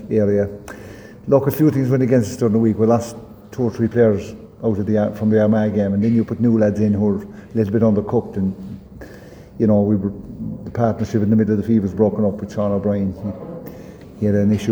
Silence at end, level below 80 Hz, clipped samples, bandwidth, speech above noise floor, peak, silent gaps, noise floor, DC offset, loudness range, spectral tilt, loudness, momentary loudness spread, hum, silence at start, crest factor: 0 s; -48 dBFS; under 0.1%; over 20 kHz; 22 dB; -2 dBFS; none; -39 dBFS; under 0.1%; 3 LU; -8.5 dB/octave; -18 LUFS; 18 LU; none; 0 s; 16 dB